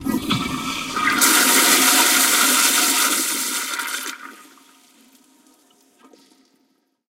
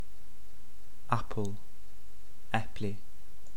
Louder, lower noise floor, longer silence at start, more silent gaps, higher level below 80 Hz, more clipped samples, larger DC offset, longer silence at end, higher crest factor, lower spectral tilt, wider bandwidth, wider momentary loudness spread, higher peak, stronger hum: first, -16 LUFS vs -37 LUFS; first, -66 dBFS vs -57 dBFS; about the same, 0 s vs 0.05 s; neither; about the same, -54 dBFS vs -54 dBFS; neither; second, under 0.1% vs 4%; first, 2.75 s vs 0 s; second, 20 dB vs 28 dB; second, -0.5 dB/octave vs -6 dB/octave; second, 16.5 kHz vs 19 kHz; second, 13 LU vs 25 LU; first, 0 dBFS vs -10 dBFS; neither